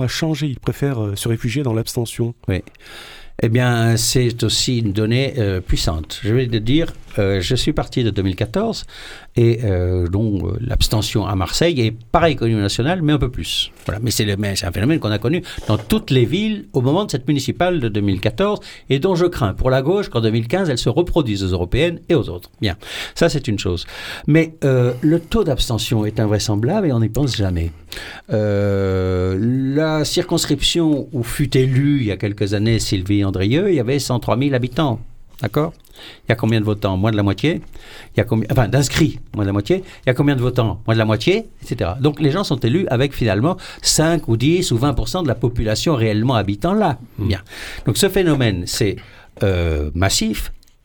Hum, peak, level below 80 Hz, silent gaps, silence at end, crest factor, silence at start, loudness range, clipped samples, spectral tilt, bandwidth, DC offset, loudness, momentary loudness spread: none; -2 dBFS; -32 dBFS; none; 0.3 s; 16 dB; 0 s; 2 LU; under 0.1%; -5.5 dB/octave; 19 kHz; under 0.1%; -18 LUFS; 7 LU